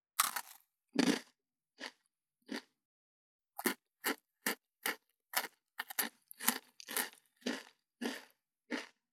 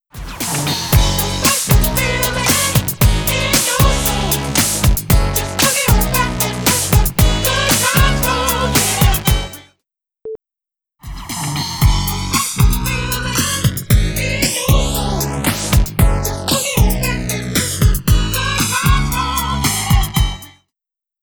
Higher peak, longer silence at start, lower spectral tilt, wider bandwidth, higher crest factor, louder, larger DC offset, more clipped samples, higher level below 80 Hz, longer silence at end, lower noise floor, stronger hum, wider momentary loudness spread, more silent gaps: second, -10 dBFS vs 0 dBFS; about the same, 0.2 s vs 0.15 s; second, -2 dB/octave vs -3.5 dB/octave; about the same, 19.5 kHz vs over 20 kHz; first, 32 dB vs 16 dB; second, -39 LUFS vs -15 LUFS; neither; neither; second, under -90 dBFS vs -20 dBFS; second, 0.25 s vs 0.75 s; second, -83 dBFS vs -87 dBFS; neither; first, 15 LU vs 7 LU; first, 2.85-3.39 s vs none